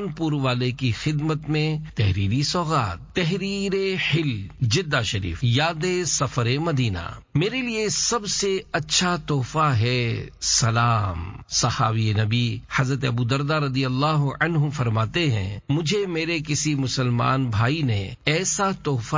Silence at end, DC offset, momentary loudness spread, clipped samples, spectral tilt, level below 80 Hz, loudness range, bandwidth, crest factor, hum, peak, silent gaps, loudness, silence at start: 0 s; under 0.1%; 5 LU; under 0.1%; -4.5 dB/octave; -42 dBFS; 2 LU; 7.6 kHz; 18 dB; none; -6 dBFS; none; -23 LUFS; 0 s